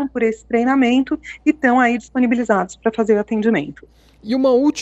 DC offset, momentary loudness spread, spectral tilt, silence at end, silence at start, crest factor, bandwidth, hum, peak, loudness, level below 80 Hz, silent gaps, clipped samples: under 0.1%; 7 LU; -5.5 dB/octave; 0 s; 0 s; 14 dB; 8.2 kHz; none; -4 dBFS; -17 LUFS; -52 dBFS; none; under 0.1%